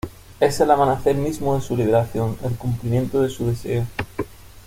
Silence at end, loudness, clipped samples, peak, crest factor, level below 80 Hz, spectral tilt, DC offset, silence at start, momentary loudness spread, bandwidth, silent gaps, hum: 0.05 s; -21 LUFS; under 0.1%; -2 dBFS; 18 dB; -42 dBFS; -7 dB/octave; under 0.1%; 0.05 s; 12 LU; 16.5 kHz; none; none